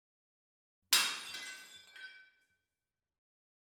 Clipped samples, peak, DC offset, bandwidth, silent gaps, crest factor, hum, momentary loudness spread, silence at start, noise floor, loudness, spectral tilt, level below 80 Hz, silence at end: under 0.1%; -14 dBFS; under 0.1%; 17.5 kHz; none; 28 dB; none; 23 LU; 0.9 s; under -90 dBFS; -32 LUFS; 3 dB/octave; under -90 dBFS; 1.55 s